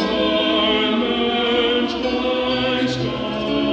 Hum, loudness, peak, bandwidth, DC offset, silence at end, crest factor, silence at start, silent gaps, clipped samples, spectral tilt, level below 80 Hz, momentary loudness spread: none; -19 LUFS; -6 dBFS; 8.2 kHz; under 0.1%; 0 s; 12 dB; 0 s; none; under 0.1%; -5.5 dB/octave; -44 dBFS; 5 LU